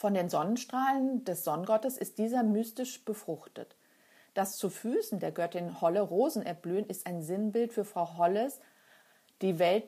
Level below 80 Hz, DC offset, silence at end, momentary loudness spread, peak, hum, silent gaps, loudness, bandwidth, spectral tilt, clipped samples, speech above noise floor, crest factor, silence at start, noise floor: -88 dBFS; under 0.1%; 0 s; 9 LU; -16 dBFS; none; none; -32 LUFS; 15.5 kHz; -5.5 dB/octave; under 0.1%; 32 dB; 16 dB; 0 s; -64 dBFS